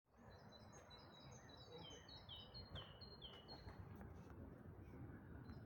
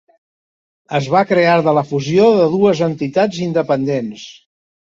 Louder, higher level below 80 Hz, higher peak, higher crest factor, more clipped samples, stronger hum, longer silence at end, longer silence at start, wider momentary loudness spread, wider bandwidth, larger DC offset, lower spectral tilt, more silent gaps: second, -59 LUFS vs -15 LUFS; second, -68 dBFS vs -56 dBFS; second, -42 dBFS vs -2 dBFS; about the same, 16 dB vs 14 dB; neither; neither; second, 0 s vs 0.65 s; second, 0.05 s vs 0.9 s; second, 6 LU vs 10 LU; first, 17 kHz vs 7.6 kHz; neither; second, -5 dB/octave vs -6.5 dB/octave; neither